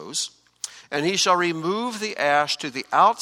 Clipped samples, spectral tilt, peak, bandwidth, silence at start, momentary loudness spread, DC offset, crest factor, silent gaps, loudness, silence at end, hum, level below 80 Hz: under 0.1%; -2.5 dB/octave; -4 dBFS; 16 kHz; 0 s; 14 LU; under 0.1%; 18 dB; none; -22 LUFS; 0 s; none; -72 dBFS